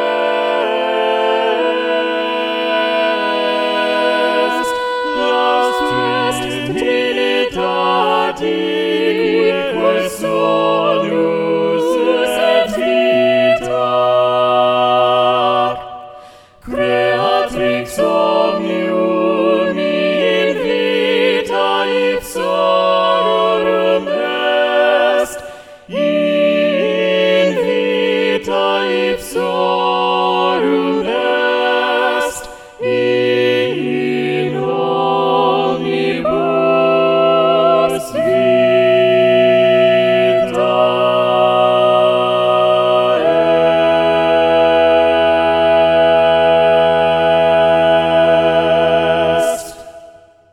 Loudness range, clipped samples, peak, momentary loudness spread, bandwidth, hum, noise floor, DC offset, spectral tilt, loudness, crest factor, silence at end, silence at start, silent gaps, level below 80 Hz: 4 LU; under 0.1%; -2 dBFS; 6 LU; 15 kHz; none; -41 dBFS; under 0.1%; -5 dB/octave; -14 LUFS; 12 dB; 0.45 s; 0 s; none; -48 dBFS